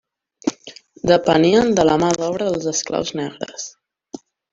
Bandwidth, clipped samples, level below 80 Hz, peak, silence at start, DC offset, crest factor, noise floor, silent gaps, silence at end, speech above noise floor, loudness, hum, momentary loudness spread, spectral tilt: 7.8 kHz; under 0.1%; -50 dBFS; -2 dBFS; 0.45 s; under 0.1%; 18 dB; -43 dBFS; none; 0.8 s; 25 dB; -18 LUFS; none; 25 LU; -4.5 dB/octave